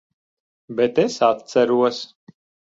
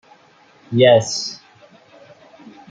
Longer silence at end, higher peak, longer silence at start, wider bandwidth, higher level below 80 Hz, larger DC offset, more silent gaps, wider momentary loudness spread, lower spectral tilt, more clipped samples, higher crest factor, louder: second, 0.65 s vs 1.35 s; about the same, -4 dBFS vs -2 dBFS; about the same, 0.7 s vs 0.7 s; second, 7.8 kHz vs 9.4 kHz; about the same, -66 dBFS vs -64 dBFS; neither; neither; second, 13 LU vs 17 LU; about the same, -5 dB/octave vs -4.5 dB/octave; neither; about the same, 18 dB vs 18 dB; second, -19 LUFS vs -16 LUFS